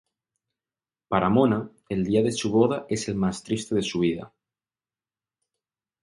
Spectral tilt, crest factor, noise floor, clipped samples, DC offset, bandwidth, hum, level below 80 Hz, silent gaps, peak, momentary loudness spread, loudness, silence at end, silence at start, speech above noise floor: -6 dB/octave; 20 dB; under -90 dBFS; under 0.1%; under 0.1%; 11.5 kHz; none; -56 dBFS; none; -6 dBFS; 8 LU; -25 LUFS; 1.75 s; 1.1 s; over 66 dB